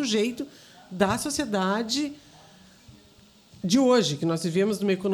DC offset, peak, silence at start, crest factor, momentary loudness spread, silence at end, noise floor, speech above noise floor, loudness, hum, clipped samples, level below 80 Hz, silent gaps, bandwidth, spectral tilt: under 0.1%; -6 dBFS; 0 s; 20 dB; 14 LU; 0 s; -55 dBFS; 31 dB; -25 LUFS; none; under 0.1%; -60 dBFS; none; 19 kHz; -4.5 dB/octave